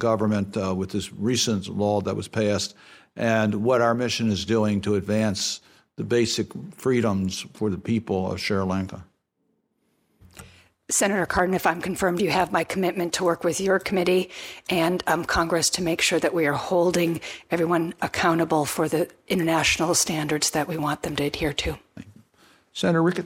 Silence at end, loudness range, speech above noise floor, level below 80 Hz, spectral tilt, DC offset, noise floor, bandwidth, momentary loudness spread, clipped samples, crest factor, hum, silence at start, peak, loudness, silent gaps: 0 s; 4 LU; 49 dB; -52 dBFS; -4 dB/octave; under 0.1%; -72 dBFS; 16.5 kHz; 7 LU; under 0.1%; 18 dB; none; 0 s; -6 dBFS; -24 LUFS; none